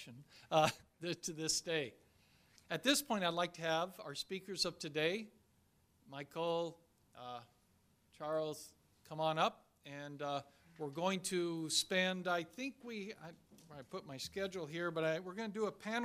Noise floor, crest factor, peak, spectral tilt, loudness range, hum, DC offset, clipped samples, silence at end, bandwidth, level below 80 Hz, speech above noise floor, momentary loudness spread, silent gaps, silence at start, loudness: -74 dBFS; 24 dB; -18 dBFS; -3 dB/octave; 6 LU; none; under 0.1%; under 0.1%; 0 s; 15.5 kHz; -76 dBFS; 34 dB; 17 LU; none; 0 s; -39 LUFS